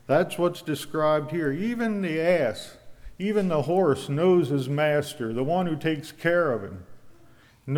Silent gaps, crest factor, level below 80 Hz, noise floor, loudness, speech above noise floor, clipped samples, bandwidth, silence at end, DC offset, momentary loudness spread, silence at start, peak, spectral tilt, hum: none; 16 dB; -56 dBFS; -55 dBFS; -25 LUFS; 30 dB; under 0.1%; 18 kHz; 0 s; under 0.1%; 9 LU; 0.1 s; -10 dBFS; -6.5 dB/octave; none